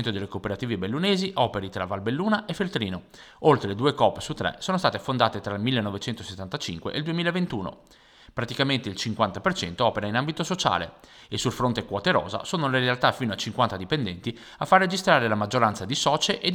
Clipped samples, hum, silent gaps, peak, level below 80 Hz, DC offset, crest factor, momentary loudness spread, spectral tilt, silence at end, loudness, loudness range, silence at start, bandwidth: under 0.1%; none; none; -4 dBFS; -56 dBFS; under 0.1%; 22 dB; 10 LU; -4.5 dB/octave; 0 s; -25 LUFS; 4 LU; 0 s; 18 kHz